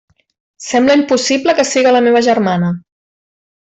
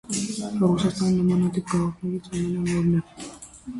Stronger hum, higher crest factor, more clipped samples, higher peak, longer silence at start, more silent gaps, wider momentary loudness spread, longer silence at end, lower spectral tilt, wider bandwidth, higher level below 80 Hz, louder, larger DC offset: neither; about the same, 12 dB vs 14 dB; neither; first, -2 dBFS vs -10 dBFS; first, 0.6 s vs 0.1 s; neither; second, 8 LU vs 15 LU; first, 0.95 s vs 0 s; second, -4.5 dB/octave vs -6.5 dB/octave; second, 8.4 kHz vs 11.5 kHz; second, -56 dBFS vs -50 dBFS; first, -12 LUFS vs -24 LUFS; neither